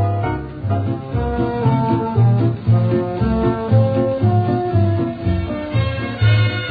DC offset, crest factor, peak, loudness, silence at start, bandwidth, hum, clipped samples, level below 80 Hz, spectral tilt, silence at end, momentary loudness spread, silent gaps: under 0.1%; 12 dB; -4 dBFS; -18 LUFS; 0 s; 4.9 kHz; none; under 0.1%; -34 dBFS; -11 dB/octave; 0 s; 7 LU; none